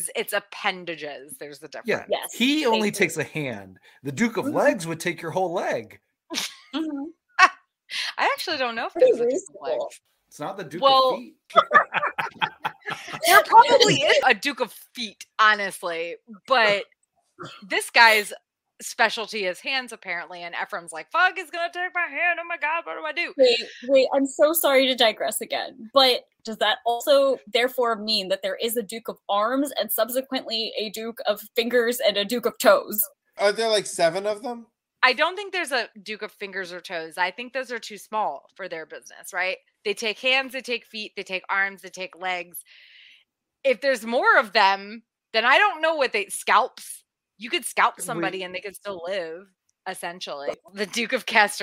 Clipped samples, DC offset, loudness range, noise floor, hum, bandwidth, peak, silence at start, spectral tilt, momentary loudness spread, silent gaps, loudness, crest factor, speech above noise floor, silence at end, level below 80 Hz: under 0.1%; under 0.1%; 9 LU; -63 dBFS; none; 16 kHz; 0 dBFS; 0 s; -2.5 dB/octave; 16 LU; none; -23 LUFS; 24 dB; 40 dB; 0 s; -74 dBFS